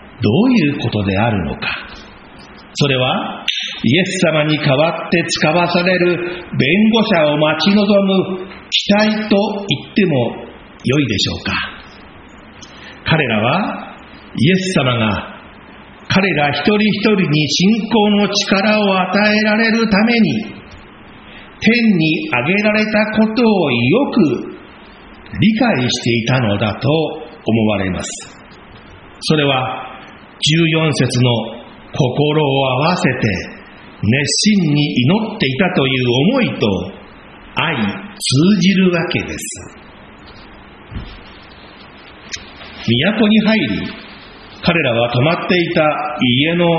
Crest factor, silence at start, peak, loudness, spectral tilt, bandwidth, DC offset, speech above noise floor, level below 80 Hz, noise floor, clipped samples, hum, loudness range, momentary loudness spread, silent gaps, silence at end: 16 dB; 0 s; 0 dBFS; -15 LUFS; -4 dB/octave; 8 kHz; under 0.1%; 24 dB; -44 dBFS; -38 dBFS; under 0.1%; none; 5 LU; 15 LU; none; 0 s